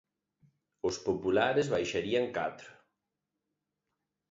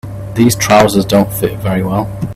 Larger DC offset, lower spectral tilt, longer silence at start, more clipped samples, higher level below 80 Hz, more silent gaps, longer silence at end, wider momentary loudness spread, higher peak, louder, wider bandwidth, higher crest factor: neither; about the same, -5 dB/octave vs -5.5 dB/octave; first, 0.85 s vs 0.05 s; neither; second, -64 dBFS vs -36 dBFS; neither; first, 1.6 s vs 0 s; about the same, 9 LU vs 8 LU; second, -14 dBFS vs 0 dBFS; second, -31 LUFS vs -12 LUFS; second, 8 kHz vs 16 kHz; first, 22 dB vs 12 dB